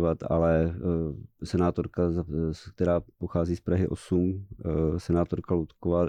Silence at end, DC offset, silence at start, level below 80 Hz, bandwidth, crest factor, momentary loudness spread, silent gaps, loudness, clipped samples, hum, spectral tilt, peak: 0 s; under 0.1%; 0 s; -42 dBFS; 10 kHz; 14 dB; 6 LU; none; -28 LUFS; under 0.1%; none; -9 dB/octave; -14 dBFS